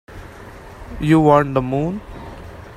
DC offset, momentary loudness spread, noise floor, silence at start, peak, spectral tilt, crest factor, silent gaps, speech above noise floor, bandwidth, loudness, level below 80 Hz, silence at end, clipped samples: under 0.1%; 25 LU; -38 dBFS; 0.1 s; 0 dBFS; -8 dB/octave; 20 dB; none; 22 dB; 13 kHz; -17 LUFS; -38 dBFS; 0 s; under 0.1%